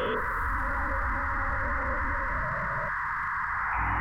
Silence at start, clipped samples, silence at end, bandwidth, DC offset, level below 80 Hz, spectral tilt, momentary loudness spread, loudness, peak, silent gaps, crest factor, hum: 0 s; under 0.1%; 0 s; 16.5 kHz; under 0.1%; -36 dBFS; -6.5 dB/octave; 1 LU; -29 LUFS; -18 dBFS; none; 12 dB; none